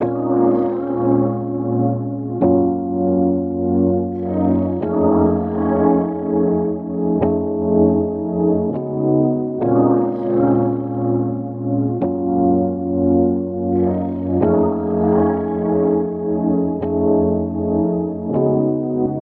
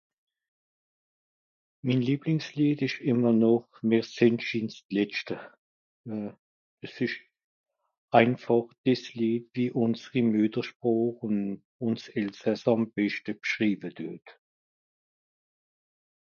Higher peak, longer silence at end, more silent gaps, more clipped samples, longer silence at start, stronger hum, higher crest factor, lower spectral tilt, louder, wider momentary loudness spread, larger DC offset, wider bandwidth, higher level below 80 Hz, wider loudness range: first, -2 dBFS vs -6 dBFS; second, 0.1 s vs 1.9 s; second, none vs 4.85-4.89 s, 5.58-6.04 s, 6.39-6.78 s, 7.44-7.64 s, 7.98-8.08 s, 8.78-8.84 s, 10.75-10.80 s, 11.65-11.79 s; neither; second, 0 s vs 1.85 s; neither; second, 14 dB vs 24 dB; first, -14 dB/octave vs -7 dB/octave; first, -18 LUFS vs -28 LUFS; second, 5 LU vs 14 LU; neither; second, 3.2 kHz vs 7 kHz; first, -44 dBFS vs -74 dBFS; second, 1 LU vs 7 LU